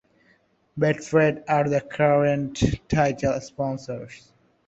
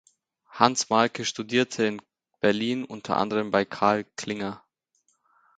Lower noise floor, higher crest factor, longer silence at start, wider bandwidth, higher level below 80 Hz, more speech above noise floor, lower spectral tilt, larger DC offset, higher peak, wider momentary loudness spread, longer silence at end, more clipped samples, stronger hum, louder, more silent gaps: second, -63 dBFS vs -71 dBFS; second, 18 dB vs 26 dB; first, 0.75 s vs 0.5 s; second, 8.2 kHz vs 9.4 kHz; first, -46 dBFS vs -66 dBFS; second, 40 dB vs 46 dB; first, -6.5 dB/octave vs -4 dB/octave; neither; second, -6 dBFS vs 0 dBFS; about the same, 13 LU vs 11 LU; second, 0.5 s vs 1 s; neither; neither; about the same, -23 LUFS vs -25 LUFS; neither